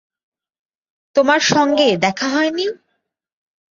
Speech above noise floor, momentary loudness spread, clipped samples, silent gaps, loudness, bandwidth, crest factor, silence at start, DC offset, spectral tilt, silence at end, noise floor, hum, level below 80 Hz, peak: 57 dB; 8 LU; under 0.1%; none; -16 LUFS; 7.6 kHz; 18 dB; 1.15 s; under 0.1%; -3.5 dB/octave; 1 s; -72 dBFS; none; -62 dBFS; -2 dBFS